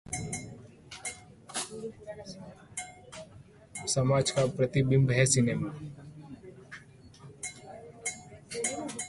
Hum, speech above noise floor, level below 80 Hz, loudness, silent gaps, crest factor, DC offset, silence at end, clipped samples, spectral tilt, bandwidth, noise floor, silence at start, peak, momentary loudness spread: none; 26 dB; -58 dBFS; -30 LUFS; none; 24 dB; under 0.1%; 0 s; under 0.1%; -4.5 dB/octave; 11.5 kHz; -54 dBFS; 0.1 s; -10 dBFS; 23 LU